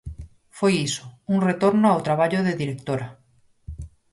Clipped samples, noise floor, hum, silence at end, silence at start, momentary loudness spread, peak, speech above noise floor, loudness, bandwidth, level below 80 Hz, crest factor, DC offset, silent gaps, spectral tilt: under 0.1%; -44 dBFS; none; 0.25 s; 0.05 s; 21 LU; -8 dBFS; 23 dB; -22 LUFS; 11.5 kHz; -46 dBFS; 16 dB; under 0.1%; none; -6 dB/octave